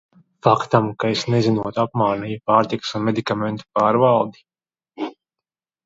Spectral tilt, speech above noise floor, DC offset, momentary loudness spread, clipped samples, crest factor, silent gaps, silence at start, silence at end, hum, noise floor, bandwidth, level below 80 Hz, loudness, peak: -6.5 dB/octave; 68 dB; under 0.1%; 10 LU; under 0.1%; 20 dB; none; 0.45 s; 0.75 s; none; -87 dBFS; 7.8 kHz; -60 dBFS; -20 LUFS; 0 dBFS